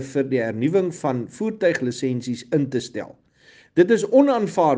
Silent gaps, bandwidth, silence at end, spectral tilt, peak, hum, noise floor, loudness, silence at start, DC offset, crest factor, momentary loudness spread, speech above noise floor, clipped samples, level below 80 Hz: none; 9.6 kHz; 0 s; -6.5 dB/octave; -4 dBFS; none; -53 dBFS; -21 LUFS; 0 s; under 0.1%; 18 dB; 11 LU; 33 dB; under 0.1%; -66 dBFS